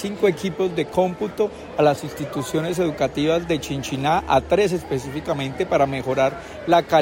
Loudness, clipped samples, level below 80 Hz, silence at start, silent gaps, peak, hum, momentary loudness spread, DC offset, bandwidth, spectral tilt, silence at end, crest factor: -22 LUFS; under 0.1%; -46 dBFS; 0 s; none; -4 dBFS; none; 7 LU; under 0.1%; 16.5 kHz; -5.5 dB/octave; 0 s; 18 dB